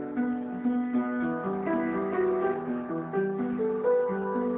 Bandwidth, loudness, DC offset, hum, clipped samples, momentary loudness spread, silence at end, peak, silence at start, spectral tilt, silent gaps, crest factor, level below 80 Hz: 3.7 kHz; -29 LUFS; under 0.1%; none; under 0.1%; 5 LU; 0 s; -16 dBFS; 0 s; -12 dB/octave; none; 12 dB; -64 dBFS